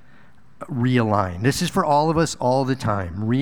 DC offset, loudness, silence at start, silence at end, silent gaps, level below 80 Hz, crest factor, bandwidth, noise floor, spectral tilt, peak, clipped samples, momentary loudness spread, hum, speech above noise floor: 0.7%; -21 LUFS; 0.6 s; 0 s; none; -46 dBFS; 18 dB; 18 kHz; -53 dBFS; -6 dB/octave; -4 dBFS; under 0.1%; 6 LU; none; 33 dB